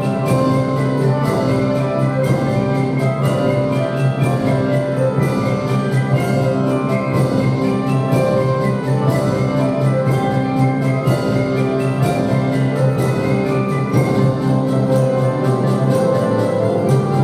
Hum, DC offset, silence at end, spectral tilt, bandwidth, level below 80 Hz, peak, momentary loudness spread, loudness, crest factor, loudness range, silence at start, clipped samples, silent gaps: none; under 0.1%; 0 s; -8 dB/octave; 14.5 kHz; -44 dBFS; -2 dBFS; 2 LU; -17 LUFS; 12 dB; 1 LU; 0 s; under 0.1%; none